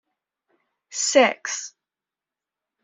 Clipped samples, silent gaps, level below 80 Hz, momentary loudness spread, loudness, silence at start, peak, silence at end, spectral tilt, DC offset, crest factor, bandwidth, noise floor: under 0.1%; none; -76 dBFS; 16 LU; -21 LUFS; 0.9 s; -4 dBFS; 1.15 s; -0.5 dB/octave; under 0.1%; 22 dB; 8.2 kHz; -89 dBFS